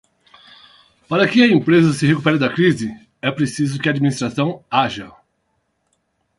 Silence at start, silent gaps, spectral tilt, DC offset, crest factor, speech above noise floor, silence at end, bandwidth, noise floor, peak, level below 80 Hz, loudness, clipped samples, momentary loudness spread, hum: 1.1 s; none; -6 dB/octave; under 0.1%; 18 dB; 52 dB; 1.3 s; 11.5 kHz; -68 dBFS; 0 dBFS; -56 dBFS; -17 LUFS; under 0.1%; 11 LU; none